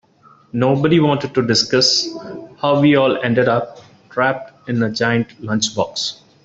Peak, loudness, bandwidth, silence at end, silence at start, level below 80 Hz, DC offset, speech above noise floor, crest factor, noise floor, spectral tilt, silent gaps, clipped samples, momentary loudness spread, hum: -2 dBFS; -17 LUFS; 8 kHz; 0.3 s; 0.55 s; -56 dBFS; under 0.1%; 34 dB; 16 dB; -50 dBFS; -4.5 dB/octave; none; under 0.1%; 13 LU; none